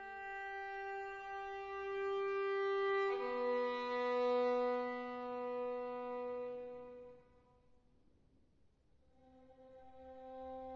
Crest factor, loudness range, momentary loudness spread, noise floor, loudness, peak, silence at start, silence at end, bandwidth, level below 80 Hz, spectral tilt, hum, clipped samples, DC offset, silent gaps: 16 dB; 16 LU; 18 LU; -73 dBFS; -40 LUFS; -26 dBFS; 0 s; 0 s; 7.4 kHz; -74 dBFS; -1.5 dB/octave; none; under 0.1%; under 0.1%; none